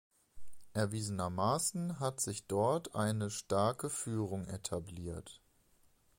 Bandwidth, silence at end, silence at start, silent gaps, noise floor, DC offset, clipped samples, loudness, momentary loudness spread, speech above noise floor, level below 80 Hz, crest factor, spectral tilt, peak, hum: 16.5 kHz; 0.8 s; 0.35 s; none; -69 dBFS; under 0.1%; under 0.1%; -36 LUFS; 10 LU; 33 dB; -62 dBFS; 18 dB; -5 dB/octave; -20 dBFS; none